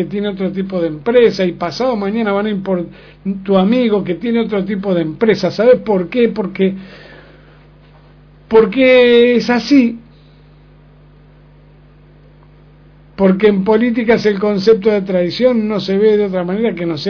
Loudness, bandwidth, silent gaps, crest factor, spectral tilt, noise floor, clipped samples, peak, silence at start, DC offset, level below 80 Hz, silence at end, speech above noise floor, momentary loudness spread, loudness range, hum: -14 LUFS; 5.4 kHz; none; 14 dB; -7 dB/octave; -43 dBFS; under 0.1%; 0 dBFS; 0 s; under 0.1%; -46 dBFS; 0 s; 30 dB; 9 LU; 5 LU; 50 Hz at -45 dBFS